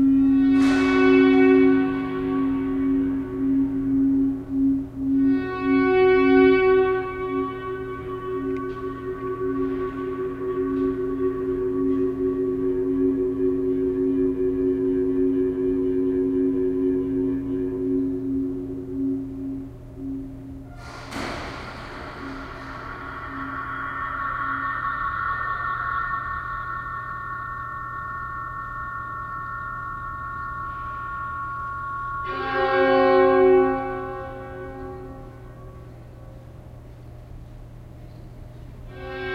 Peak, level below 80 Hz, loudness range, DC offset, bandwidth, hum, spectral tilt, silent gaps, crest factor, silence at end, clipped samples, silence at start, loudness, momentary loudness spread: -6 dBFS; -44 dBFS; 14 LU; under 0.1%; 7 kHz; none; -7.5 dB/octave; none; 18 dB; 0 s; under 0.1%; 0 s; -23 LUFS; 22 LU